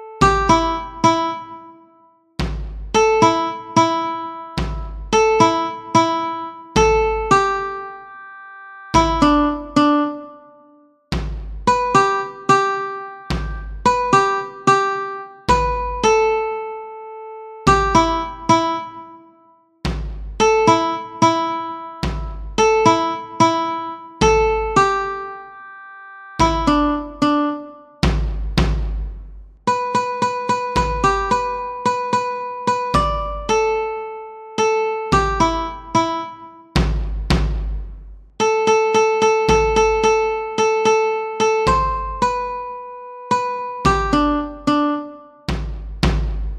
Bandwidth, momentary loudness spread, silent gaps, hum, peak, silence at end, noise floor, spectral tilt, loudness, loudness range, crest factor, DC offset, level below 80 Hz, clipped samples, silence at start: 11.5 kHz; 16 LU; none; none; 0 dBFS; 0 s; -54 dBFS; -5 dB/octave; -18 LUFS; 3 LU; 18 dB; under 0.1%; -30 dBFS; under 0.1%; 0 s